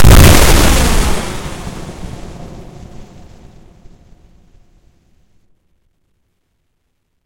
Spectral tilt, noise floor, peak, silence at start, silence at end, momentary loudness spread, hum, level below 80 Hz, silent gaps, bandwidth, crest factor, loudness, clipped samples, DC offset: -4.5 dB/octave; -65 dBFS; 0 dBFS; 0 s; 4.25 s; 28 LU; none; -18 dBFS; none; over 20 kHz; 12 dB; -10 LUFS; 0.7%; under 0.1%